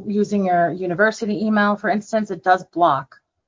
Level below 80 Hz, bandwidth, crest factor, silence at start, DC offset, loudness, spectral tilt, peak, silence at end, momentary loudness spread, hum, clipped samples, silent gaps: -64 dBFS; 7.6 kHz; 16 dB; 0 s; under 0.1%; -19 LUFS; -6.5 dB/octave; -4 dBFS; 0.45 s; 4 LU; none; under 0.1%; none